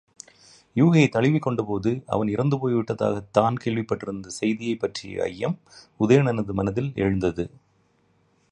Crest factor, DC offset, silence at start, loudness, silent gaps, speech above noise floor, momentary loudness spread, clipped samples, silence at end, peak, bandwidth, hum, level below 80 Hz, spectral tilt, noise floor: 20 dB; under 0.1%; 0.75 s; -24 LUFS; none; 41 dB; 11 LU; under 0.1%; 1.05 s; -4 dBFS; 11 kHz; none; -52 dBFS; -7 dB/octave; -64 dBFS